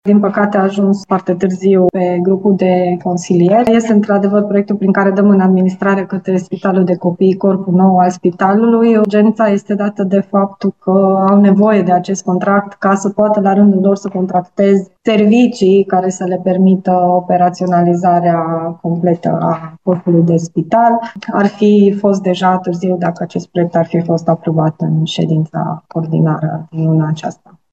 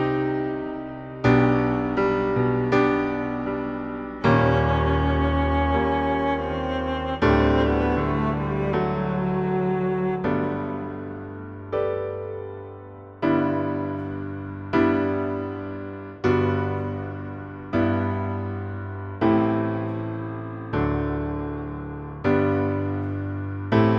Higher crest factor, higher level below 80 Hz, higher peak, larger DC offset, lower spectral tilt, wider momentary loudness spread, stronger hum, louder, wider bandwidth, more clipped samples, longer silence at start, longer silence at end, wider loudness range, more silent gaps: second, 12 dB vs 18 dB; second, -56 dBFS vs -38 dBFS; first, 0 dBFS vs -6 dBFS; first, 0.1% vs under 0.1%; second, -7.5 dB/octave vs -9 dB/octave; second, 7 LU vs 13 LU; neither; first, -12 LUFS vs -24 LUFS; first, 8 kHz vs 7.2 kHz; neither; about the same, 0.05 s vs 0 s; first, 0.4 s vs 0 s; about the same, 3 LU vs 5 LU; neither